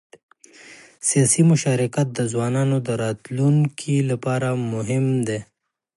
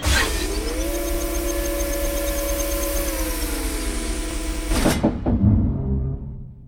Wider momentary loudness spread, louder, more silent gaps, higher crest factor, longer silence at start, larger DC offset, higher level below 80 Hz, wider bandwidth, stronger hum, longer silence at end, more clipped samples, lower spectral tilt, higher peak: about the same, 8 LU vs 8 LU; about the same, -21 LUFS vs -23 LUFS; neither; about the same, 16 dB vs 16 dB; first, 0.65 s vs 0 s; neither; second, -62 dBFS vs -26 dBFS; second, 11.5 kHz vs 19.5 kHz; neither; first, 0.55 s vs 0 s; neither; about the same, -5.5 dB/octave vs -4.5 dB/octave; about the same, -4 dBFS vs -6 dBFS